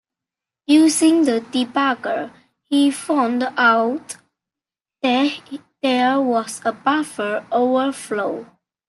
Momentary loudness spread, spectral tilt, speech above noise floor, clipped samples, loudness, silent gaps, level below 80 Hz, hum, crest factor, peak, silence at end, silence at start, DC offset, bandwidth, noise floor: 13 LU; -3 dB/octave; 71 dB; under 0.1%; -19 LUFS; none; -72 dBFS; none; 16 dB; -4 dBFS; 0.45 s; 0.7 s; under 0.1%; 12.5 kHz; -89 dBFS